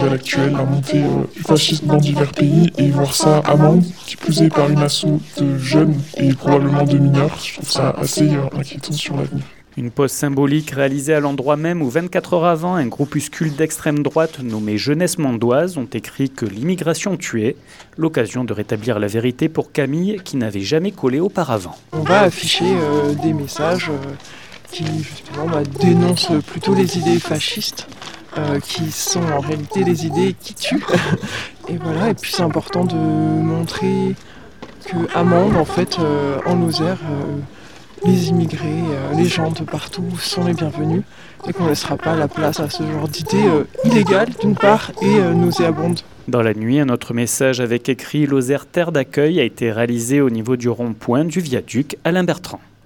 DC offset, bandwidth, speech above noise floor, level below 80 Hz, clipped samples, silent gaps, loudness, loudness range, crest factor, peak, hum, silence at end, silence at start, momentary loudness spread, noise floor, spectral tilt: 0.7%; 19 kHz; 21 dB; -50 dBFS; under 0.1%; none; -18 LUFS; 5 LU; 18 dB; 0 dBFS; none; 0.25 s; 0 s; 10 LU; -38 dBFS; -5.5 dB/octave